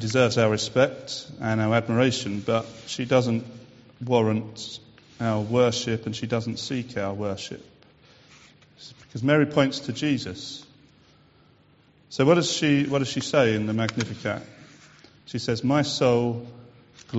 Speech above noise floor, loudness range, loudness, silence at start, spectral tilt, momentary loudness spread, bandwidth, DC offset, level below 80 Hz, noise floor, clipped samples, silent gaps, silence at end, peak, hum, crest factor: 34 dB; 4 LU; -24 LUFS; 0 s; -5 dB/octave; 15 LU; 8 kHz; under 0.1%; -60 dBFS; -58 dBFS; under 0.1%; none; 0 s; -6 dBFS; none; 20 dB